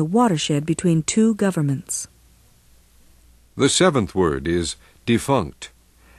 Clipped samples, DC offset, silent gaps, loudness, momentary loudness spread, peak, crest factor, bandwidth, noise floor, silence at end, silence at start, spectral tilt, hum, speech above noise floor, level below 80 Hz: under 0.1%; under 0.1%; none; -20 LUFS; 14 LU; -2 dBFS; 18 dB; 13 kHz; -53 dBFS; 0.5 s; 0 s; -5 dB/octave; none; 34 dB; -46 dBFS